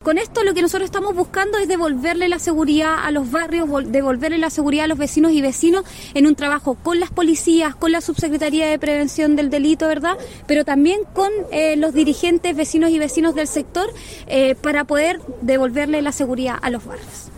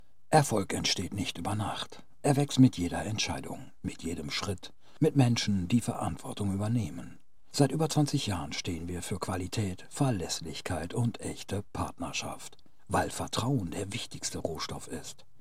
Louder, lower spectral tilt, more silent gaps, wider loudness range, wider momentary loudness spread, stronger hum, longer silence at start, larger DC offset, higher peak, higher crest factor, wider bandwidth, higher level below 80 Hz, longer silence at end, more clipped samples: first, -18 LUFS vs -31 LUFS; about the same, -4 dB/octave vs -5 dB/octave; neither; second, 2 LU vs 5 LU; second, 6 LU vs 14 LU; neither; second, 0 s vs 0.3 s; second, under 0.1% vs 0.5%; first, -4 dBFS vs -8 dBFS; second, 14 dB vs 24 dB; about the same, 16.5 kHz vs 15.5 kHz; first, -42 dBFS vs -56 dBFS; second, 0 s vs 0.3 s; neither